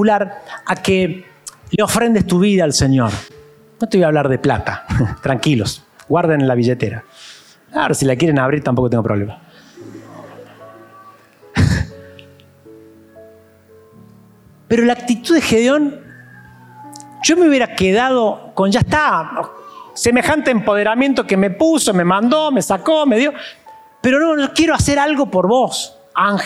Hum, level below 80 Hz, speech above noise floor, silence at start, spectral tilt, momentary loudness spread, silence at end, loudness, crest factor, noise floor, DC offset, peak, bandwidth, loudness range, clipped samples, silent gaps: none; -42 dBFS; 32 dB; 0 s; -5 dB/octave; 15 LU; 0 s; -15 LUFS; 14 dB; -46 dBFS; under 0.1%; -2 dBFS; 15.5 kHz; 10 LU; under 0.1%; none